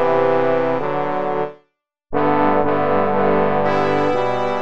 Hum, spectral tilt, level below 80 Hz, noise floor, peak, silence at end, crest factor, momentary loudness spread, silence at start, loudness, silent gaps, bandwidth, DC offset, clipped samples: none; -7.5 dB/octave; -52 dBFS; -65 dBFS; -4 dBFS; 0 s; 14 dB; 5 LU; 0 s; -18 LUFS; none; 7.8 kHz; 4%; under 0.1%